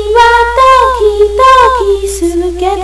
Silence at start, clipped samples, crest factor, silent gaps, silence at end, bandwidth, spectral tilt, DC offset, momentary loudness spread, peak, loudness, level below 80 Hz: 0 s; 4%; 8 dB; none; 0 s; 11 kHz; -4 dB/octave; under 0.1%; 8 LU; 0 dBFS; -7 LUFS; -24 dBFS